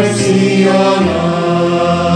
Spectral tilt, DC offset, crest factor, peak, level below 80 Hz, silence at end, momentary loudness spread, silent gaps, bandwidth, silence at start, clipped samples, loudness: -6 dB/octave; under 0.1%; 10 dB; 0 dBFS; -42 dBFS; 0 s; 3 LU; none; 10 kHz; 0 s; under 0.1%; -12 LUFS